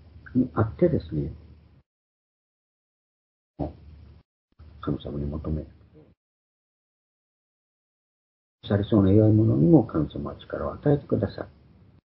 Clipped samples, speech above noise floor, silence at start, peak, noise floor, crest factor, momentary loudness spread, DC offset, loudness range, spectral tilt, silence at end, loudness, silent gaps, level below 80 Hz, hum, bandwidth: under 0.1%; 25 dB; 0.15 s; -4 dBFS; -48 dBFS; 24 dB; 17 LU; under 0.1%; 19 LU; -13 dB/octave; 0.7 s; -25 LUFS; 1.86-3.54 s, 4.25-4.48 s, 6.17-8.59 s; -44 dBFS; none; 5.2 kHz